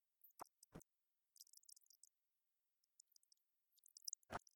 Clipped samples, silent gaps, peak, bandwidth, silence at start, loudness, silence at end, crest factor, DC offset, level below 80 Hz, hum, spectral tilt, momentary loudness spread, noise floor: under 0.1%; none; -32 dBFS; 19 kHz; 0.25 s; -59 LUFS; 0.2 s; 32 dB; under 0.1%; -82 dBFS; none; -2 dB/octave; 14 LU; under -90 dBFS